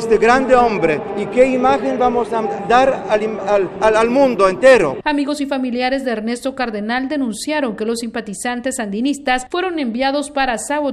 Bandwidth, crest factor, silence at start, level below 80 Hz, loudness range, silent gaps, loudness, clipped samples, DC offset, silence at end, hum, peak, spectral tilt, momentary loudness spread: 13 kHz; 16 dB; 0 s; -44 dBFS; 6 LU; none; -16 LUFS; under 0.1%; under 0.1%; 0 s; none; 0 dBFS; -4.5 dB/octave; 9 LU